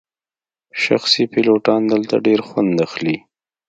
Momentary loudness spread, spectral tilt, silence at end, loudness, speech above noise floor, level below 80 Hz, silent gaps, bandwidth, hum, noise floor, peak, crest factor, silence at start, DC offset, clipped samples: 8 LU; -5 dB/octave; 0.5 s; -17 LUFS; over 74 dB; -62 dBFS; none; 9 kHz; none; under -90 dBFS; 0 dBFS; 18 dB; 0.75 s; under 0.1%; under 0.1%